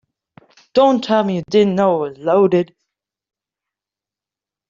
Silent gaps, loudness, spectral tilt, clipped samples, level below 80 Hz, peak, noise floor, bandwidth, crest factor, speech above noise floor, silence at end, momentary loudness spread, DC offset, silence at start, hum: none; -16 LUFS; -7 dB/octave; under 0.1%; -62 dBFS; -2 dBFS; -88 dBFS; 7.4 kHz; 16 dB; 74 dB; 2.05 s; 6 LU; under 0.1%; 0.75 s; none